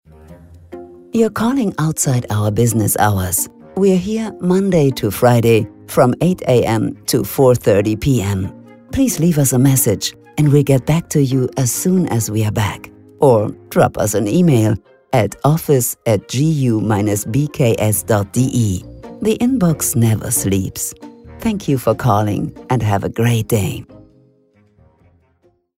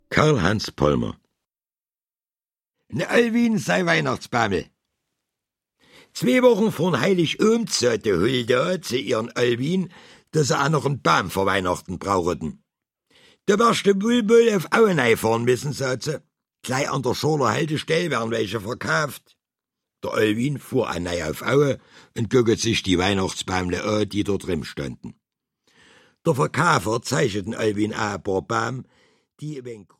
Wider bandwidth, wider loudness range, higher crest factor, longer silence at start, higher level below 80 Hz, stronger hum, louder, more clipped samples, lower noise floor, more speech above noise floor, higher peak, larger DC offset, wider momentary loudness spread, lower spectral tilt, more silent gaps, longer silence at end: about the same, 16.5 kHz vs 16 kHz; about the same, 3 LU vs 5 LU; second, 16 dB vs 22 dB; first, 0.3 s vs 0.1 s; first, -42 dBFS vs -52 dBFS; neither; first, -16 LUFS vs -22 LUFS; neither; second, -58 dBFS vs under -90 dBFS; second, 43 dB vs over 69 dB; about the same, 0 dBFS vs -2 dBFS; neither; second, 9 LU vs 12 LU; about the same, -6 dB/octave vs -5 dB/octave; neither; first, 1.85 s vs 0.2 s